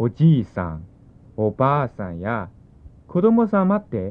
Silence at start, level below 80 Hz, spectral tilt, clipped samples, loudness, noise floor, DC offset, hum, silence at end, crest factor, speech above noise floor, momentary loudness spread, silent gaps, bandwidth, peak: 0 s; -48 dBFS; -11 dB/octave; under 0.1%; -21 LUFS; -46 dBFS; under 0.1%; none; 0 s; 16 dB; 27 dB; 13 LU; none; 4.1 kHz; -4 dBFS